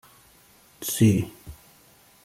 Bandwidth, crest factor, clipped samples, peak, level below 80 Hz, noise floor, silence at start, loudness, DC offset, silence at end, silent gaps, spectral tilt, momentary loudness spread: 16 kHz; 20 dB; under 0.1%; -8 dBFS; -54 dBFS; -56 dBFS; 0.8 s; -24 LUFS; under 0.1%; 0.7 s; none; -6 dB/octave; 25 LU